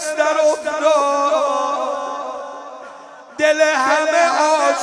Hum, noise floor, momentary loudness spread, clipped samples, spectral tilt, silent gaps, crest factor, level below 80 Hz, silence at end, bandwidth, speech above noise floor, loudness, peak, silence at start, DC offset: none; -38 dBFS; 18 LU; under 0.1%; -0.5 dB/octave; none; 16 dB; -70 dBFS; 0 s; 11 kHz; 23 dB; -16 LUFS; -2 dBFS; 0 s; under 0.1%